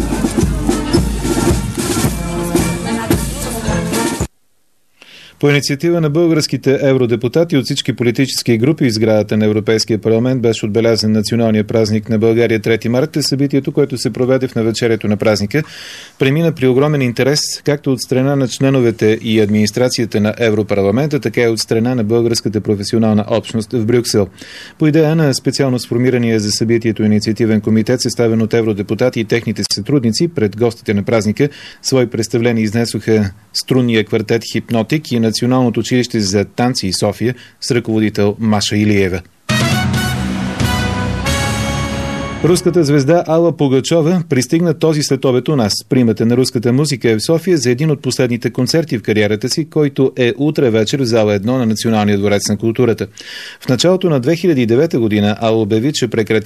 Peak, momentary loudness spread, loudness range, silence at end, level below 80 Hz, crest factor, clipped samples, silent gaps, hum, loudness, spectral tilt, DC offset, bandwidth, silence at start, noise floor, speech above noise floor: 0 dBFS; 5 LU; 2 LU; 0 s; -34 dBFS; 14 dB; under 0.1%; none; none; -14 LUFS; -5.5 dB/octave; 0.2%; 14 kHz; 0 s; -63 dBFS; 50 dB